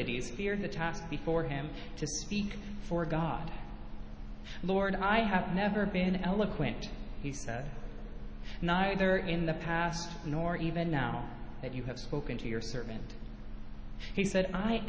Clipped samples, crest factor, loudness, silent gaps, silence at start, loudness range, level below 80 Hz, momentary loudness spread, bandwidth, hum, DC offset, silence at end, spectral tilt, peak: under 0.1%; 18 dB; -34 LUFS; none; 0 s; 5 LU; -44 dBFS; 18 LU; 8 kHz; none; under 0.1%; 0 s; -5.5 dB/octave; -16 dBFS